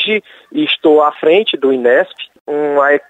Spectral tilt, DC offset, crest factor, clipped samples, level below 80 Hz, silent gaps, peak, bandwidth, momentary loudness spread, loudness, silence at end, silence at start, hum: -5.5 dB/octave; under 0.1%; 12 dB; under 0.1%; -64 dBFS; 2.41-2.45 s; -2 dBFS; 7.8 kHz; 11 LU; -13 LUFS; 0.1 s; 0 s; none